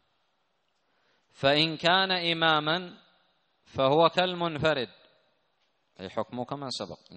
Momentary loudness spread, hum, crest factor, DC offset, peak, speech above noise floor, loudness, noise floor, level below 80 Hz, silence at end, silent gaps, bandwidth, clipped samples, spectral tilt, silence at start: 14 LU; none; 22 dB; under 0.1%; -8 dBFS; 48 dB; -26 LUFS; -75 dBFS; -66 dBFS; 0 s; none; 8.4 kHz; under 0.1%; -5 dB/octave; 1.4 s